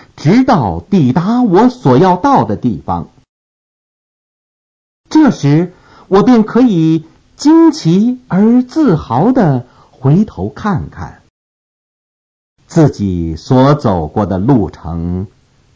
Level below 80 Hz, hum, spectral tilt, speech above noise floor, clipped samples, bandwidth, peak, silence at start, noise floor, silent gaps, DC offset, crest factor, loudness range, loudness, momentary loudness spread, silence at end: -36 dBFS; none; -8 dB/octave; over 80 dB; under 0.1%; 7.8 kHz; 0 dBFS; 0.15 s; under -90 dBFS; 3.29-5.04 s, 11.30-12.56 s; under 0.1%; 12 dB; 6 LU; -11 LUFS; 11 LU; 0.5 s